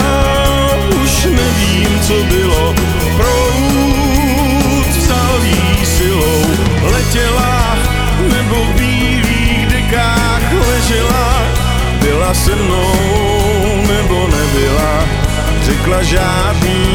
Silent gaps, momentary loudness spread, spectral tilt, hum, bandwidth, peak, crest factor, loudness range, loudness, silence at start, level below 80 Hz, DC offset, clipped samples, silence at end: none; 2 LU; -4.5 dB/octave; none; over 20 kHz; 0 dBFS; 12 dB; 1 LU; -12 LUFS; 0 s; -16 dBFS; under 0.1%; under 0.1%; 0 s